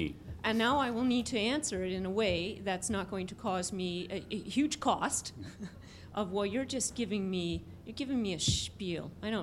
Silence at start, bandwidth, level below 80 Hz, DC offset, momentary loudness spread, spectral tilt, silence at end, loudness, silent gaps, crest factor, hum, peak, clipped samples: 0 s; 15.5 kHz; -54 dBFS; under 0.1%; 10 LU; -4 dB/octave; 0 s; -34 LUFS; none; 20 dB; none; -14 dBFS; under 0.1%